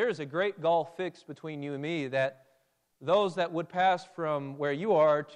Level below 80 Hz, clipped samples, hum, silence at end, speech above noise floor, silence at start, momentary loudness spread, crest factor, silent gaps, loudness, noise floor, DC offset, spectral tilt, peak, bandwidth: -80 dBFS; under 0.1%; none; 0 s; 42 dB; 0 s; 12 LU; 14 dB; none; -30 LUFS; -72 dBFS; under 0.1%; -6 dB/octave; -14 dBFS; 10 kHz